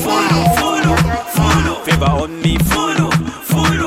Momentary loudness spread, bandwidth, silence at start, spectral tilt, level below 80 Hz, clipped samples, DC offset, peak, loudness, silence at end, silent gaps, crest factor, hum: 4 LU; 16.5 kHz; 0 s; -5 dB/octave; -28 dBFS; under 0.1%; under 0.1%; 0 dBFS; -14 LUFS; 0 s; none; 14 dB; none